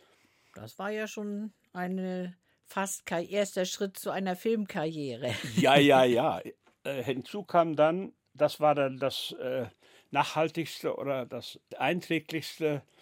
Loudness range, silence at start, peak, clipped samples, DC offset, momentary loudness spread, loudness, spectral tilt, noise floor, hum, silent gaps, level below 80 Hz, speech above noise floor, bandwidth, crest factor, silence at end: 8 LU; 0.55 s; -8 dBFS; under 0.1%; under 0.1%; 14 LU; -30 LUFS; -5 dB/octave; -66 dBFS; none; none; -78 dBFS; 36 dB; 16.5 kHz; 22 dB; 0.2 s